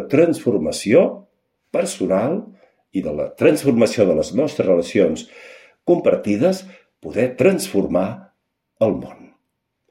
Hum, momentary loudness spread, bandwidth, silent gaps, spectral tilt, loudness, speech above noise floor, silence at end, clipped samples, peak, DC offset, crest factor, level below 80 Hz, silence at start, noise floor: none; 12 LU; 16 kHz; none; -6 dB/octave; -19 LUFS; 56 dB; 0.8 s; under 0.1%; -2 dBFS; under 0.1%; 18 dB; -54 dBFS; 0 s; -74 dBFS